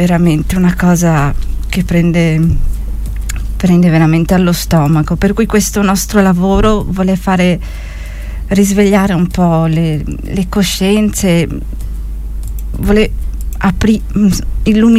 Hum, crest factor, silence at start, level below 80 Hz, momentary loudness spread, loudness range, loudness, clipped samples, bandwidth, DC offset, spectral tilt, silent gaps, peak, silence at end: none; 10 dB; 0 s; -20 dBFS; 13 LU; 4 LU; -12 LUFS; under 0.1%; 16 kHz; under 0.1%; -6 dB/octave; none; 0 dBFS; 0 s